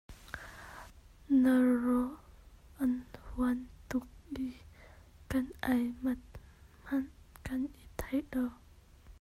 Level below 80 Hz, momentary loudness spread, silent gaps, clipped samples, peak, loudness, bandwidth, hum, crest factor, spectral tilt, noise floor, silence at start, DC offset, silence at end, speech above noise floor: -54 dBFS; 21 LU; none; under 0.1%; -18 dBFS; -34 LUFS; 14.5 kHz; none; 18 dB; -6.5 dB/octave; -57 dBFS; 0.1 s; under 0.1%; 0.05 s; 27 dB